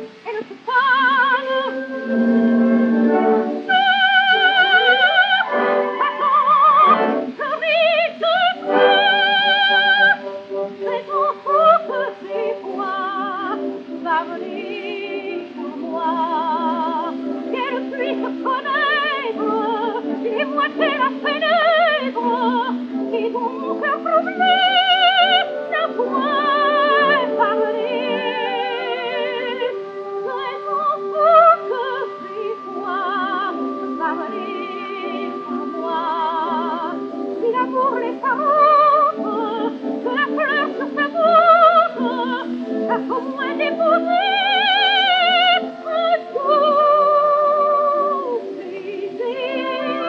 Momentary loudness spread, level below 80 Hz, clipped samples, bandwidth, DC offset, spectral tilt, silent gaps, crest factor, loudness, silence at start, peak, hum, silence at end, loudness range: 13 LU; -80 dBFS; under 0.1%; 7 kHz; under 0.1%; -5 dB/octave; none; 18 dB; -17 LUFS; 0 s; 0 dBFS; none; 0 s; 9 LU